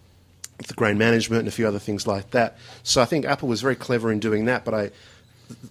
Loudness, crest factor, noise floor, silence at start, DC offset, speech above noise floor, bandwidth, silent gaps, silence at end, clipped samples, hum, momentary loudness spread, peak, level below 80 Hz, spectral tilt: -23 LUFS; 20 dB; -46 dBFS; 0.6 s; under 0.1%; 23 dB; 16 kHz; none; 0 s; under 0.1%; none; 13 LU; -4 dBFS; -52 dBFS; -4.5 dB/octave